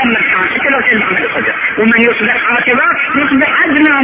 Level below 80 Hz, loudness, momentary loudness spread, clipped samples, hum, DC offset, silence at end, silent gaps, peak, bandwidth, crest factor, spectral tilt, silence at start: -46 dBFS; -10 LUFS; 4 LU; under 0.1%; none; under 0.1%; 0 s; none; 0 dBFS; 4 kHz; 10 dB; -7.5 dB/octave; 0 s